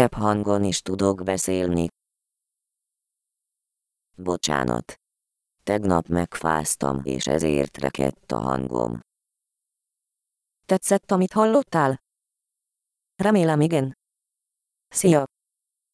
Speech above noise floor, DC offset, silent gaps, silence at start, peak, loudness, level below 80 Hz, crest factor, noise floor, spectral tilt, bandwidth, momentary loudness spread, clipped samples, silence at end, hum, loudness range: 62 dB; under 0.1%; none; 0 s; -2 dBFS; -23 LUFS; -50 dBFS; 24 dB; -84 dBFS; -5 dB/octave; 11 kHz; 9 LU; under 0.1%; 0.7 s; none; 7 LU